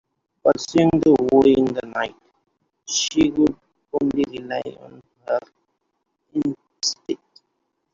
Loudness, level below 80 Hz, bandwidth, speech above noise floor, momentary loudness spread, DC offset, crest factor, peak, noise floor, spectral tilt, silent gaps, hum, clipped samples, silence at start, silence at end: -21 LUFS; -54 dBFS; 7.6 kHz; 55 dB; 15 LU; under 0.1%; 20 dB; -2 dBFS; -74 dBFS; -4.5 dB/octave; none; none; under 0.1%; 0.45 s; 0.8 s